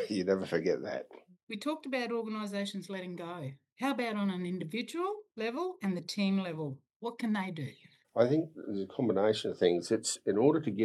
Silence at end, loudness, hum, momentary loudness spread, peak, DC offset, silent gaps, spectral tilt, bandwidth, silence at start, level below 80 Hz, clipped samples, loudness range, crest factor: 0 s; -34 LUFS; none; 13 LU; -12 dBFS; under 0.1%; 1.43-1.47 s, 3.72-3.76 s, 6.96-7.00 s; -5.5 dB/octave; 12.5 kHz; 0 s; -84 dBFS; under 0.1%; 5 LU; 20 dB